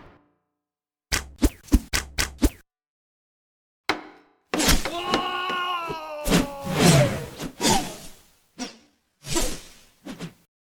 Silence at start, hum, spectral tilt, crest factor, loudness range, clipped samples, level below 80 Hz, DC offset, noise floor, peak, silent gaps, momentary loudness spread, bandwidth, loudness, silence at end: 1.1 s; none; -4 dB/octave; 22 dB; 6 LU; under 0.1%; -34 dBFS; under 0.1%; under -90 dBFS; -4 dBFS; 2.87-3.84 s; 18 LU; over 20 kHz; -24 LUFS; 0.5 s